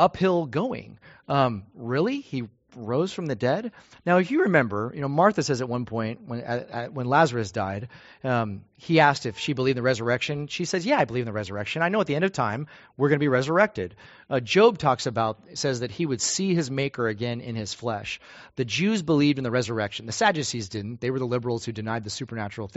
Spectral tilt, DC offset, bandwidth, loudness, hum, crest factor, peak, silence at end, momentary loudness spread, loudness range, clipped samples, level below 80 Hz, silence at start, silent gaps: -4.5 dB/octave; under 0.1%; 8 kHz; -25 LUFS; none; 22 dB; -4 dBFS; 0.1 s; 12 LU; 4 LU; under 0.1%; -60 dBFS; 0 s; none